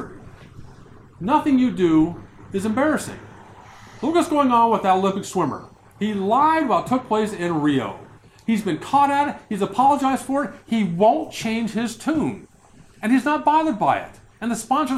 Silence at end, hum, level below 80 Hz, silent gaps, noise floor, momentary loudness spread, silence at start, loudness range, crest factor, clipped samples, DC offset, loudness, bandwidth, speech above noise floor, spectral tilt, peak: 0 s; none; -54 dBFS; none; -49 dBFS; 12 LU; 0 s; 2 LU; 16 dB; under 0.1%; under 0.1%; -21 LUFS; 14.5 kHz; 30 dB; -5.5 dB/octave; -4 dBFS